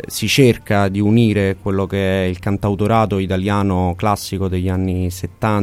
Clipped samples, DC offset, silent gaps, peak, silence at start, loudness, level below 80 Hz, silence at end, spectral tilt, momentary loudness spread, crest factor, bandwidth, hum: under 0.1%; under 0.1%; none; 0 dBFS; 0.05 s; -17 LUFS; -40 dBFS; 0 s; -6 dB/octave; 7 LU; 16 dB; 16 kHz; none